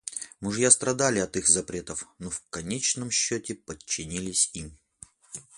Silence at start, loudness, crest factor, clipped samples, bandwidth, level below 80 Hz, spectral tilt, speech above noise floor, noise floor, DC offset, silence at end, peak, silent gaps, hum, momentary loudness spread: 0.05 s; -25 LUFS; 26 dB; under 0.1%; 11.5 kHz; -56 dBFS; -2.5 dB/octave; 26 dB; -53 dBFS; under 0.1%; 0.15 s; -2 dBFS; none; none; 18 LU